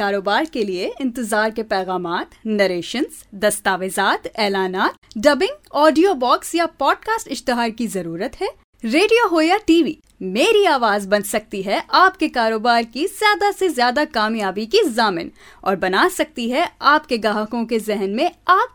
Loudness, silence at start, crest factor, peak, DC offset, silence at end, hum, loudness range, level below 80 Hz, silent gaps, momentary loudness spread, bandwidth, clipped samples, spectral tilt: -18 LUFS; 0 s; 18 dB; 0 dBFS; under 0.1%; 0.05 s; none; 4 LU; -52 dBFS; 4.98-5.02 s, 8.64-8.73 s; 10 LU; over 20 kHz; under 0.1%; -3.5 dB/octave